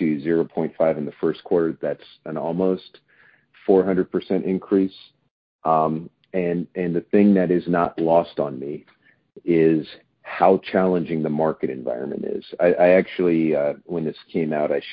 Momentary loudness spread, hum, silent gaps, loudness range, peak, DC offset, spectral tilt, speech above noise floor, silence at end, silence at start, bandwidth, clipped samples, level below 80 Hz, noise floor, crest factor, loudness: 12 LU; none; 5.31-5.59 s; 3 LU; -2 dBFS; under 0.1%; -12 dB/octave; 36 dB; 0 s; 0 s; 5.2 kHz; under 0.1%; -58 dBFS; -57 dBFS; 18 dB; -21 LUFS